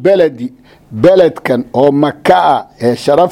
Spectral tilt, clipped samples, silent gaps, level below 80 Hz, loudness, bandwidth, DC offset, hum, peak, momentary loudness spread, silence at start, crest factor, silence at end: -6.5 dB/octave; 0.4%; none; -48 dBFS; -11 LUFS; 15 kHz; under 0.1%; none; 0 dBFS; 10 LU; 0 s; 10 dB; 0 s